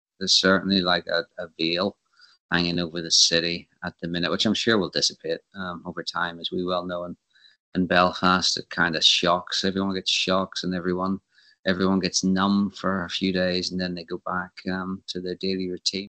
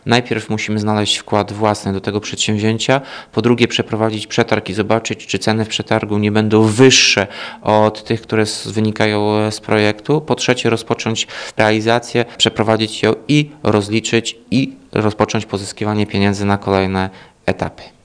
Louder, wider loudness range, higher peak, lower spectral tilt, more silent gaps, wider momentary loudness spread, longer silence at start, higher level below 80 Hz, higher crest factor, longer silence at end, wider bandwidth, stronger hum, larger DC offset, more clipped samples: second, -24 LUFS vs -16 LUFS; about the same, 5 LU vs 4 LU; second, -4 dBFS vs 0 dBFS; about the same, -3.5 dB/octave vs -4.5 dB/octave; first, 2.40-2.49 s, 7.60-7.72 s, 11.59-11.63 s vs none; first, 13 LU vs 7 LU; first, 0.2 s vs 0.05 s; second, -60 dBFS vs -52 dBFS; about the same, 20 dB vs 16 dB; about the same, 0.05 s vs 0.15 s; second, 8.8 kHz vs 10.5 kHz; neither; neither; neither